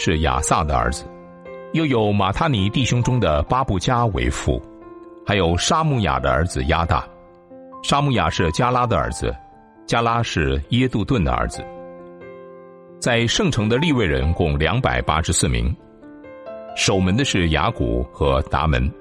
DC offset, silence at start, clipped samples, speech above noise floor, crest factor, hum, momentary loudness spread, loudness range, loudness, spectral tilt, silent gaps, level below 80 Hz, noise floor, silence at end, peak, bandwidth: under 0.1%; 0 s; under 0.1%; 25 dB; 16 dB; none; 20 LU; 3 LU; -20 LUFS; -5 dB/octave; none; -32 dBFS; -43 dBFS; 0 s; -4 dBFS; 13.5 kHz